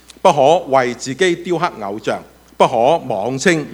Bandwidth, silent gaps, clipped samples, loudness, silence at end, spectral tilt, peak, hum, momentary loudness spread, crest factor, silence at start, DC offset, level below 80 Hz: 16 kHz; none; under 0.1%; -16 LUFS; 0 s; -4.5 dB/octave; 0 dBFS; none; 10 LU; 16 dB; 0.25 s; under 0.1%; -54 dBFS